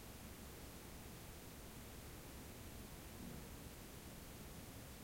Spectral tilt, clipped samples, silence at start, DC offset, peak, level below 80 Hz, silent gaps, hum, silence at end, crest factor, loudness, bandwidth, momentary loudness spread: -4 dB/octave; under 0.1%; 0 s; under 0.1%; -40 dBFS; -60 dBFS; none; none; 0 s; 14 dB; -55 LUFS; 16.5 kHz; 2 LU